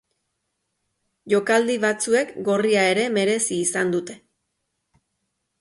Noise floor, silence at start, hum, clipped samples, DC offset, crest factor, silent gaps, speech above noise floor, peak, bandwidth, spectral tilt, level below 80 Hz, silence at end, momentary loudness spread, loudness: -76 dBFS; 1.25 s; none; under 0.1%; under 0.1%; 16 dB; none; 56 dB; -6 dBFS; 11.5 kHz; -3.5 dB/octave; -70 dBFS; 1.45 s; 5 LU; -21 LUFS